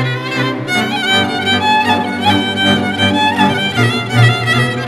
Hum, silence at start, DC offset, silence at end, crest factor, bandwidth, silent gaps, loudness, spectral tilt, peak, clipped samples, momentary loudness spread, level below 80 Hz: none; 0 s; under 0.1%; 0 s; 14 dB; 14 kHz; none; -13 LUFS; -5 dB/octave; 0 dBFS; under 0.1%; 4 LU; -52 dBFS